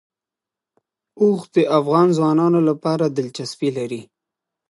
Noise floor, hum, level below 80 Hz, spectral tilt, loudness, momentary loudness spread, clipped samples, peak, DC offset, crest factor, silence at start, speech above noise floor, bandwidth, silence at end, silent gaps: -87 dBFS; none; -70 dBFS; -7 dB/octave; -19 LUFS; 12 LU; under 0.1%; -2 dBFS; under 0.1%; 18 dB; 1.15 s; 70 dB; 11.5 kHz; 0.7 s; none